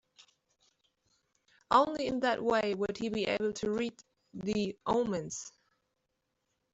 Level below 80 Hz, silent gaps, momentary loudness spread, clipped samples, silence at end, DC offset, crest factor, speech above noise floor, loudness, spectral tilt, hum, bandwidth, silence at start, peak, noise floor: -66 dBFS; none; 13 LU; under 0.1%; 1.25 s; under 0.1%; 24 dB; 51 dB; -32 LUFS; -4.5 dB/octave; none; 8.2 kHz; 1.7 s; -10 dBFS; -82 dBFS